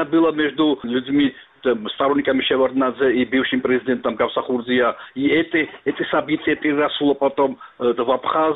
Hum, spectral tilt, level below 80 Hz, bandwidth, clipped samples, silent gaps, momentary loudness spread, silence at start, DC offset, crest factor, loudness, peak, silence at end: none; -8.5 dB/octave; -56 dBFS; 4.1 kHz; under 0.1%; none; 5 LU; 0 s; under 0.1%; 14 dB; -20 LUFS; -4 dBFS; 0 s